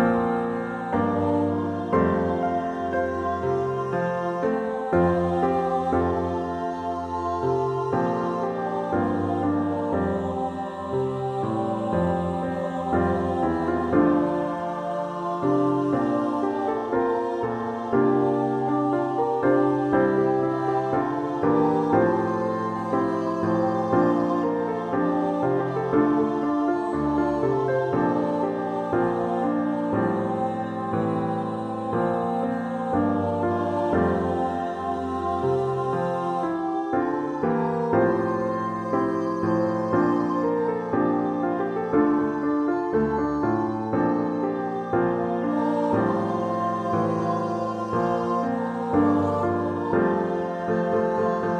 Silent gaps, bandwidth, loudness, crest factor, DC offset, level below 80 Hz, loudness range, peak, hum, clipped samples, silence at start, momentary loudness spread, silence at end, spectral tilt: none; 9.2 kHz; -24 LUFS; 16 dB; under 0.1%; -52 dBFS; 3 LU; -8 dBFS; none; under 0.1%; 0 s; 6 LU; 0 s; -8.5 dB/octave